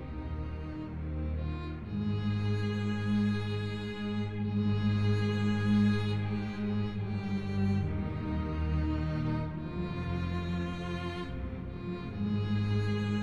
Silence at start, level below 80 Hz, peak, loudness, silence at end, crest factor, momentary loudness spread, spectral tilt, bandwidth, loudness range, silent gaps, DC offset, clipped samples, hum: 0 s; -44 dBFS; -18 dBFS; -33 LUFS; 0 s; 14 dB; 9 LU; -8 dB/octave; 7.8 kHz; 4 LU; none; 0.2%; under 0.1%; none